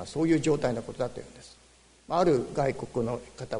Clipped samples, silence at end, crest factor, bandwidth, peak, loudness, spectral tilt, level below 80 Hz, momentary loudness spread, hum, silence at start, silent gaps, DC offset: under 0.1%; 0 s; 16 dB; 10.5 kHz; -12 dBFS; -28 LUFS; -6.5 dB/octave; -54 dBFS; 11 LU; none; 0 s; none; under 0.1%